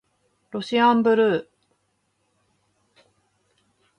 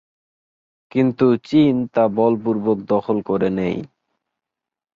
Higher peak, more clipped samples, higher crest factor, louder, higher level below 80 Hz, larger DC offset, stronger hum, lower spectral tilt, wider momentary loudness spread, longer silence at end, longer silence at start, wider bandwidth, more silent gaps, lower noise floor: about the same, -6 dBFS vs -4 dBFS; neither; about the same, 18 dB vs 16 dB; about the same, -20 LUFS vs -19 LUFS; second, -72 dBFS vs -56 dBFS; neither; neither; second, -6 dB/octave vs -9 dB/octave; first, 15 LU vs 7 LU; first, 2.55 s vs 1.1 s; second, 0.55 s vs 0.95 s; first, 9.8 kHz vs 7.2 kHz; neither; second, -71 dBFS vs -86 dBFS